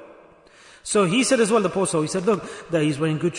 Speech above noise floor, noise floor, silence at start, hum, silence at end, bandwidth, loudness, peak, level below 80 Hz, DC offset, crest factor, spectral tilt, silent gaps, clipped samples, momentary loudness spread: 29 dB; -50 dBFS; 0 s; none; 0 s; 11 kHz; -21 LUFS; -6 dBFS; -60 dBFS; under 0.1%; 16 dB; -4.5 dB/octave; none; under 0.1%; 7 LU